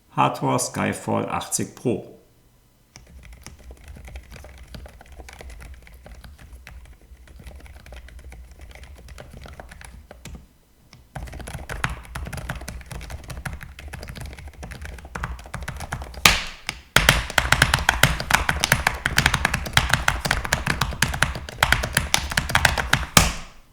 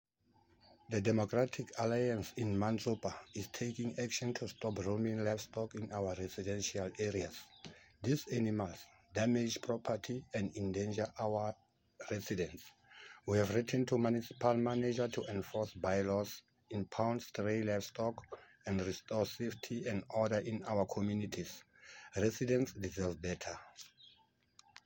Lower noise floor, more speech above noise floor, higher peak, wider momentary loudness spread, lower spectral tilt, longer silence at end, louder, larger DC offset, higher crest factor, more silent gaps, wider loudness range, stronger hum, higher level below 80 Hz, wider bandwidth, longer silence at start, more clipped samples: second, -57 dBFS vs -72 dBFS; about the same, 33 dB vs 35 dB; first, 0 dBFS vs -18 dBFS; first, 26 LU vs 14 LU; second, -3 dB/octave vs -5.5 dB/octave; second, 0.15 s vs 1 s; first, -21 LUFS vs -38 LUFS; neither; first, 26 dB vs 20 dB; neither; first, 24 LU vs 4 LU; neither; first, -36 dBFS vs -68 dBFS; first, over 20 kHz vs 17 kHz; second, 0.15 s vs 0.9 s; neither